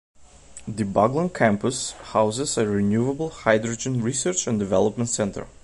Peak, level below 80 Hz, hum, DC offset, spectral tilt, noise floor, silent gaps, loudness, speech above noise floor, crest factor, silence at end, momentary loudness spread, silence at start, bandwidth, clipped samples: -2 dBFS; -50 dBFS; none; under 0.1%; -5 dB/octave; -45 dBFS; none; -23 LUFS; 22 dB; 20 dB; 0.15 s; 5 LU; 0.2 s; 11.5 kHz; under 0.1%